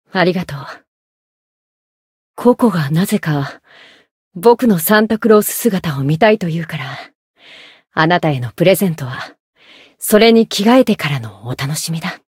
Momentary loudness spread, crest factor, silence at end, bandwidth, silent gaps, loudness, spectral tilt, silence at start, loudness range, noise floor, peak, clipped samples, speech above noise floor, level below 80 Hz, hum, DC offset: 16 LU; 16 dB; 0.2 s; 16.5 kHz; 0.88-2.34 s, 4.11-4.31 s, 7.15-7.34 s, 9.40-9.53 s; -14 LUFS; -5.5 dB/octave; 0.15 s; 5 LU; -42 dBFS; 0 dBFS; under 0.1%; 27 dB; -54 dBFS; none; under 0.1%